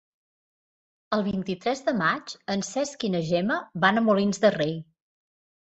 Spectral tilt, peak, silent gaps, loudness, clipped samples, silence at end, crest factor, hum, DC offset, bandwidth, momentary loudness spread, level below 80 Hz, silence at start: -5 dB/octave; -8 dBFS; none; -25 LUFS; under 0.1%; 0.85 s; 20 dB; none; under 0.1%; 8.2 kHz; 8 LU; -64 dBFS; 1.1 s